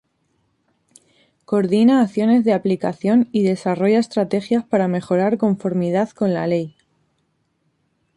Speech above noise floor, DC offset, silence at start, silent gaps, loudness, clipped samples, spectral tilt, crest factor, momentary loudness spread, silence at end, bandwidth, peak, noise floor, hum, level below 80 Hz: 50 dB; under 0.1%; 1.5 s; none; -18 LUFS; under 0.1%; -7.5 dB/octave; 14 dB; 6 LU; 1.45 s; 11 kHz; -4 dBFS; -68 dBFS; none; -64 dBFS